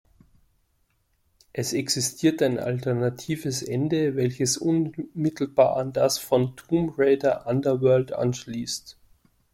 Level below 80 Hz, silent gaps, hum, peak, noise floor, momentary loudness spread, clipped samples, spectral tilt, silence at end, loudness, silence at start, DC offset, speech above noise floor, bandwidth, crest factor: -60 dBFS; none; none; -6 dBFS; -69 dBFS; 9 LU; under 0.1%; -5 dB/octave; 0.6 s; -24 LUFS; 1.55 s; under 0.1%; 45 dB; 16.5 kHz; 20 dB